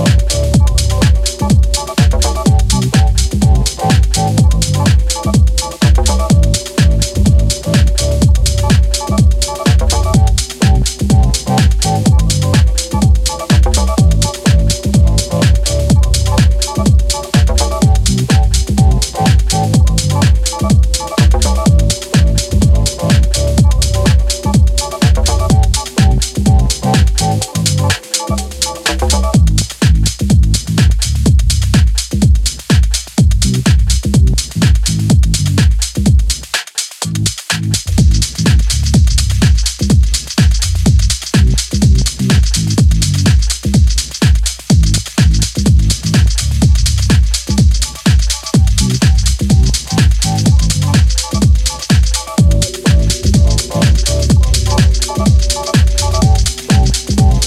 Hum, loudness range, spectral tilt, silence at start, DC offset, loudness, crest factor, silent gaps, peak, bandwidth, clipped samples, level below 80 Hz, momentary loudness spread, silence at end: none; 1 LU; -5 dB/octave; 0 s; under 0.1%; -12 LUFS; 10 dB; none; 0 dBFS; 15 kHz; under 0.1%; -14 dBFS; 2 LU; 0 s